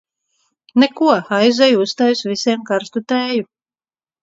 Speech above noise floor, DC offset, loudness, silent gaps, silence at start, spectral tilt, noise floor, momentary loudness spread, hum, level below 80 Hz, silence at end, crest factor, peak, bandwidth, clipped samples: over 75 dB; under 0.1%; -16 LUFS; none; 0.75 s; -4.5 dB/octave; under -90 dBFS; 8 LU; none; -68 dBFS; 0.8 s; 18 dB; 0 dBFS; 7.8 kHz; under 0.1%